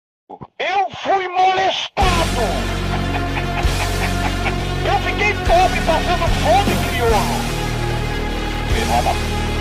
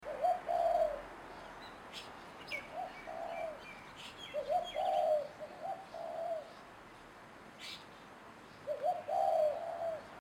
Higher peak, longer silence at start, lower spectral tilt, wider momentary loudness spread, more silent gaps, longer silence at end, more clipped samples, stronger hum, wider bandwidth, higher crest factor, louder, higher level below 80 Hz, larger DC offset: first, -4 dBFS vs -22 dBFS; first, 0.3 s vs 0 s; about the same, -4.5 dB/octave vs -3.5 dB/octave; second, 6 LU vs 21 LU; neither; about the same, 0 s vs 0 s; neither; neither; about the same, 16 kHz vs 17 kHz; about the same, 14 dB vs 16 dB; first, -18 LUFS vs -38 LUFS; first, -26 dBFS vs -68 dBFS; neither